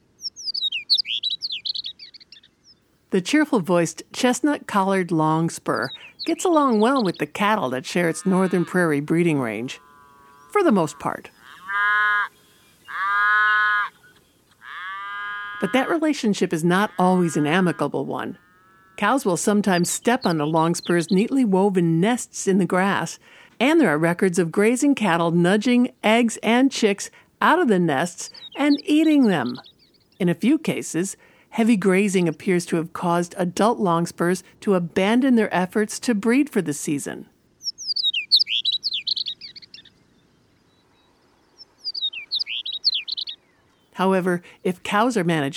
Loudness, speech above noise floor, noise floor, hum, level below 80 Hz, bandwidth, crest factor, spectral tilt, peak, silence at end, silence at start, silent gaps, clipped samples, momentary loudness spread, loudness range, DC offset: -21 LUFS; 40 dB; -60 dBFS; none; -68 dBFS; 15 kHz; 18 dB; -4.5 dB/octave; -4 dBFS; 0 s; 0.2 s; none; under 0.1%; 12 LU; 5 LU; under 0.1%